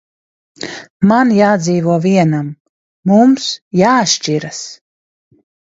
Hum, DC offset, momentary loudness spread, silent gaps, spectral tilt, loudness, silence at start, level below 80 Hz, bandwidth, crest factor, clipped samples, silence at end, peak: none; under 0.1%; 17 LU; 0.90-1.00 s, 2.60-3.03 s, 3.62-3.71 s; -5 dB/octave; -13 LUFS; 0.6 s; -58 dBFS; 8 kHz; 14 dB; under 0.1%; 1.05 s; 0 dBFS